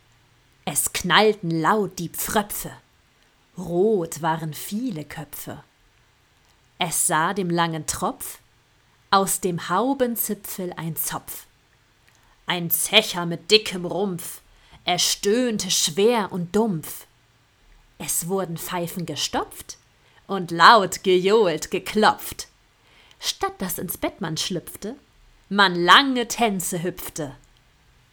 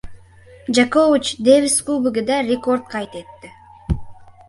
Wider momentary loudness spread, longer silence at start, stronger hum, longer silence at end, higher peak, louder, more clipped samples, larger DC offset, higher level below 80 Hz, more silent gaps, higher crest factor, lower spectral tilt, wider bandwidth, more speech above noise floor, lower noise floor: about the same, 17 LU vs 17 LU; first, 0.65 s vs 0.05 s; neither; first, 0.75 s vs 0.15 s; about the same, 0 dBFS vs -2 dBFS; second, -22 LUFS vs -18 LUFS; neither; neither; second, -54 dBFS vs -38 dBFS; neither; first, 24 dB vs 18 dB; about the same, -3 dB/octave vs -4 dB/octave; first, over 20 kHz vs 11.5 kHz; first, 37 dB vs 27 dB; first, -60 dBFS vs -45 dBFS